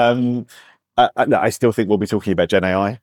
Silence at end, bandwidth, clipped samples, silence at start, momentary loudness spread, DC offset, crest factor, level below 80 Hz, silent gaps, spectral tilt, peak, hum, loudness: 0.05 s; 17.5 kHz; under 0.1%; 0 s; 5 LU; under 0.1%; 14 dB; -56 dBFS; none; -6 dB/octave; -4 dBFS; none; -18 LUFS